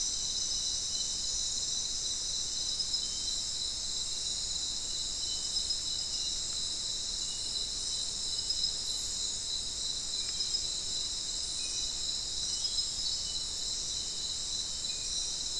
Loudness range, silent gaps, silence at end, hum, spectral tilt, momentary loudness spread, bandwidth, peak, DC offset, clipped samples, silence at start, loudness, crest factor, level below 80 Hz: 1 LU; none; 0 s; none; 0.5 dB/octave; 3 LU; 12 kHz; -18 dBFS; 0.2%; under 0.1%; 0 s; -32 LUFS; 16 dB; -52 dBFS